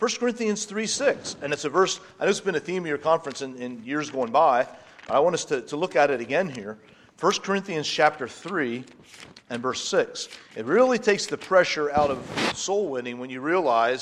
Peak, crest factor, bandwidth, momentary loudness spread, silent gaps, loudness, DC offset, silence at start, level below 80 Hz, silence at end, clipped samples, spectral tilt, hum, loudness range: -4 dBFS; 20 dB; 12.5 kHz; 13 LU; none; -25 LUFS; under 0.1%; 0 s; -62 dBFS; 0 s; under 0.1%; -3.5 dB/octave; none; 3 LU